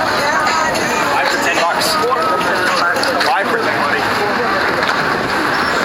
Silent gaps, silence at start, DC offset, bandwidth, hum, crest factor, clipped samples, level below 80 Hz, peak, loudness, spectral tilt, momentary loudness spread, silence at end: none; 0 s; under 0.1%; 16.5 kHz; none; 12 dB; under 0.1%; -46 dBFS; -2 dBFS; -14 LUFS; -3 dB/octave; 2 LU; 0 s